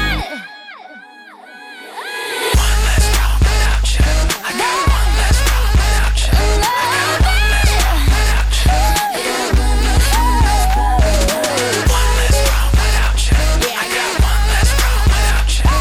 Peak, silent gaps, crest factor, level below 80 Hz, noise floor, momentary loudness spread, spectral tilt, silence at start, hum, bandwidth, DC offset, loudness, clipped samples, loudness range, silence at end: -4 dBFS; none; 10 dB; -14 dBFS; -38 dBFS; 6 LU; -3.5 dB/octave; 0 s; none; 16 kHz; under 0.1%; -15 LUFS; under 0.1%; 2 LU; 0 s